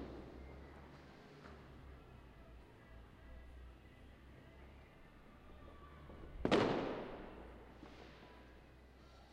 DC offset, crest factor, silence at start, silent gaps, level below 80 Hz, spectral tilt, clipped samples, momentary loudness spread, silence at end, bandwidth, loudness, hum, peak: under 0.1%; 28 dB; 0 s; none; -60 dBFS; -6 dB/octave; under 0.1%; 22 LU; 0 s; 15.5 kHz; -43 LUFS; none; -20 dBFS